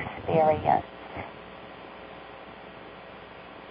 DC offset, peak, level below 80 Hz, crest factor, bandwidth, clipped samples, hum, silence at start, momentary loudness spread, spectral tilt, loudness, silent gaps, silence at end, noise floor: under 0.1%; -10 dBFS; -54 dBFS; 22 dB; 5 kHz; under 0.1%; none; 0 s; 21 LU; -5 dB/octave; -26 LUFS; none; 0 s; -45 dBFS